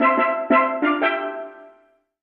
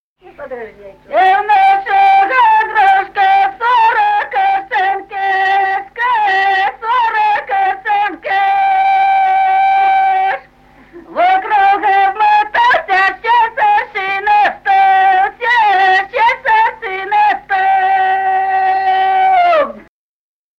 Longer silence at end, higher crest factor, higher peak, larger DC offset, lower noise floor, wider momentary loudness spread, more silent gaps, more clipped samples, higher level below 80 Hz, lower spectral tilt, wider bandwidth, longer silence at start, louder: second, 0.55 s vs 0.8 s; first, 16 dB vs 10 dB; about the same, -4 dBFS vs -2 dBFS; neither; first, -58 dBFS vs -47 dBFS; first, 15 LU vs 6 LU; neither; neither; second, -68 dBFS vs -52 dBFS; first, -7 dB/octave vs -3 dB/octave; second, 5 kHz vs 6.6 kHz; second, 0 s vs 0.4 s; second, -20 LUFS vs -12 LUFS